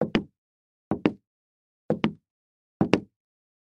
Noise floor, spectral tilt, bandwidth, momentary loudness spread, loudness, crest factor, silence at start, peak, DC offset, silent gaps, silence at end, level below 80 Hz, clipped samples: under -90 dBFS; -7 dB/octave; 8.8 kHz; 11 LU; -28 LUFS; 30 dB; 0 s; 0 dBFS; under 0.1%; 0.38-0.91 s, 1.27-1.89 s, 2.30-2.80 s; 0.6 s; -56 dBFS; under 0.1%